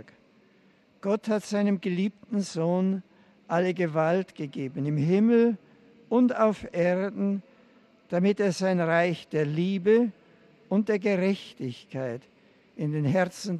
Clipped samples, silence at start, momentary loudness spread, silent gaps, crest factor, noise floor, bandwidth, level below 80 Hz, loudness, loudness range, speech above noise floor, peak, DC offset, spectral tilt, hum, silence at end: under 0.1%; 1.05 s; 12 LU; none; 18 dB; -61 dBFS; 12 kHz; -70 dBFS; -27 LUFS; 4 LU; 35 dB; -10 dBFS; under 0.1%; -7 dB/octave; none; 0 s